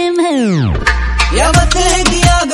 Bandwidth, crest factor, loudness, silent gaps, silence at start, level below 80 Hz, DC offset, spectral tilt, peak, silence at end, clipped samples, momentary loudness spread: 12 kHz; 10 dB; -11 LUFS; none; 0 s; -16 dBFS; under 0.1%; -4 dB/octave; 0 dBFS; 0 s; 0.3%; 4 LU